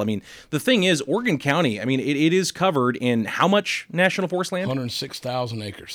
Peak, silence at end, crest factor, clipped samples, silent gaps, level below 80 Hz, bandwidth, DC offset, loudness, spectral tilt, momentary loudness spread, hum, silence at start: -6 dBFS; 0 s; 16 dB; under 0.1%; none; -62 dBFS; 19 kHz; under 0.1%; -22 LUFS; -5 dB/octave; 9 LU; none; 0 s